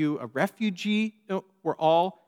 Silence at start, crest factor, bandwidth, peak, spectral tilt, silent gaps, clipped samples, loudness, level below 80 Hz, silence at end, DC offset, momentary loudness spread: 0 s; 16 dB; 15.5 kHz; -10 dBFS; -6 dB/octave; none; under 0.1%; -27 LUFS; -88 dBFS; 0.15 s; under 0.1%; 10 LU